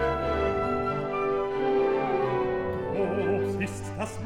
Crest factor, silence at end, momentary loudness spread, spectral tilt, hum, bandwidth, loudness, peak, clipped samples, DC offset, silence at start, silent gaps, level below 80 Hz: 14 dB; 0 s; 5 LU; -6.5 dB/octave; none; 12 kHz; -28 LUFS; -14 dBFS; under 0.1%; under 0.1%; 0 s; none; -46 dBFS